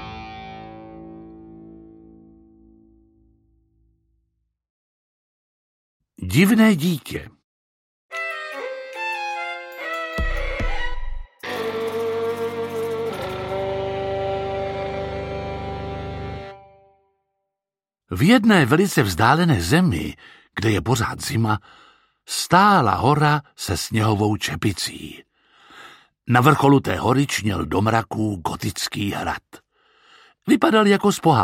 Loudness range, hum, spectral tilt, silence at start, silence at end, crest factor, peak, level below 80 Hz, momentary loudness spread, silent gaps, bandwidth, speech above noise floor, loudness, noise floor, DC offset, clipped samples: 10 LU; none; -5.5 dB/octave; 0 s; 0 s; 22 dB; 0 dBFS; -38 dBFS; 18 LU; 4.70-6.00 s, 7.44-8.09 s; 16.5 kHz; 71 dB; -21 LUFS; -89 dBFS; under 0.1%; under 0.1%